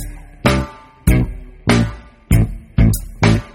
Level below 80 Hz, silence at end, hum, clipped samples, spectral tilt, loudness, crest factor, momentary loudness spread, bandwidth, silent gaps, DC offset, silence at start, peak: -22 dBFS; 0.05 s; none; under 0.1%; -6 dB/octave; -17 LUFS; 16 dB; 8 LU; 16.5 kHz; none; under 0.1%; 0 s; 0 dBFS